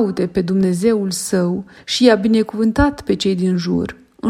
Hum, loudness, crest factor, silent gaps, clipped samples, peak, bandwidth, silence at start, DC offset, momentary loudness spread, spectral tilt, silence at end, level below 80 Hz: none; -17 LUFS; 16 dB; none; under 0.1%; 0 dBFS; 15.5 kHz; 0 s; under 0.1%; 8 LU; -5.5 dB/octave; 0 s; -38 dBFS